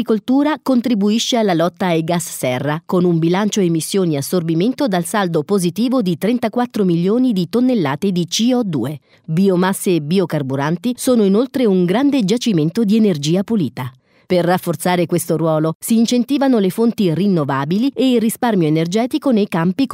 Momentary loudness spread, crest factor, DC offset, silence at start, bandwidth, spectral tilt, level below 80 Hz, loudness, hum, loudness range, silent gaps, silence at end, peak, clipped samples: 4 LU; 14 dB; under 0.1%; 0 s; 16 kHz; -6 dB/octave; -62 dBFS; -16 LUFS; none; 2 LU; 15.75-15.80 s; 0 s; -2 dBFS; under 0.1%